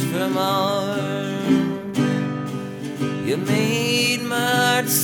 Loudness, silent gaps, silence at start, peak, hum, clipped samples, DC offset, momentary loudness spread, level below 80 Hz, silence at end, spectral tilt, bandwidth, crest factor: -21 LUFS; none; 0 s; -6 dBFS; none; under 0.1%; under 0.1%; 8 LU; -64 dBFS; 0 s; -4 dB/octave; over 20 kHz; 16 dB